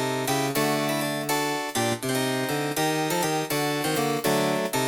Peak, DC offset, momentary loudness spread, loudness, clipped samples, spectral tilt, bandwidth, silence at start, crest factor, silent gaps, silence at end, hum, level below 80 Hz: -12 dBFS; under 0.1%; 2 LU; -25 LUFS; under 0.1%; -4 dB/octave; over 20 kHz; 0 s; 14 dB; none; 0 s; none; -64 dBFS